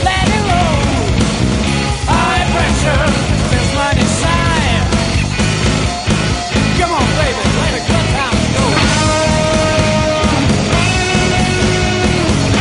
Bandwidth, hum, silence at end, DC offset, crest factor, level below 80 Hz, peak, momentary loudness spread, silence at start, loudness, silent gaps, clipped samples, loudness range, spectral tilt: 11 kHz; none; 0 s; under 0.1%; 12 dB; -22 dBFS; 0 dBFS; 2 LU; 0 s; -13 LUFS; none; under 0.1%; 1 LU; -4.5 dB/octave